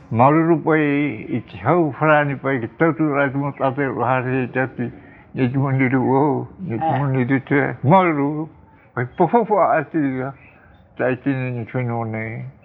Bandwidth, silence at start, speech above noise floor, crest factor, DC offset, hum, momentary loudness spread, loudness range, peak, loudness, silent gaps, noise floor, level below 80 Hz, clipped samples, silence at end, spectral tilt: 4.2 kHz; 0.1 s; 30 dB; 18 dB; under 0.1%; none; 12 LU; 3 LU; 0 dBFS; -19 LUFS; none; -48 dBFS; -56 dBFS; under 0.1%; 0.15 s; -11.5 dB/octave